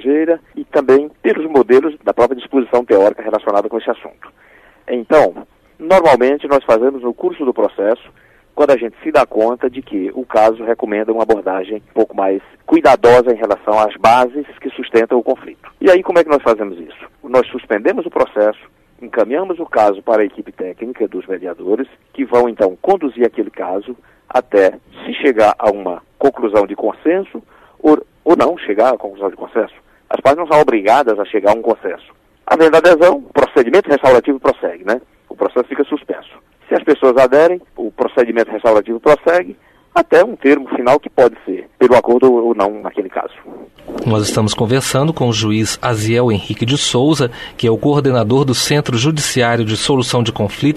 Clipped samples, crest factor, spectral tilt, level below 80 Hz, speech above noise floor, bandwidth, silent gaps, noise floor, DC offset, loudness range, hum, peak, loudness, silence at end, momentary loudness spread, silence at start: under 0.1%; 14 dB; -5.5 dB/octave; -48 dBFS; 33 dB; 13.5 kHz; none; -47 dBFS; under 0.1%; 4 LU; none; 0 dBFS; -14 LUFS; 0 s; 12 LU; 0 s